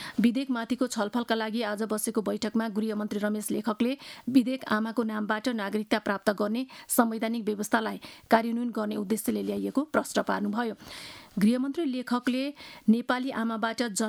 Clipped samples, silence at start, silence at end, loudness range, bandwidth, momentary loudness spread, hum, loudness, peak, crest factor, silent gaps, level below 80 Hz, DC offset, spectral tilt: under 0.1%; 0 s; 0 s; 1 LU; 19 kHz; 6 LU; none; -29 LUFS; -6 dBFS; 22 dB; none; -68 dBFS; under 0.1%; -4.5 dB/octave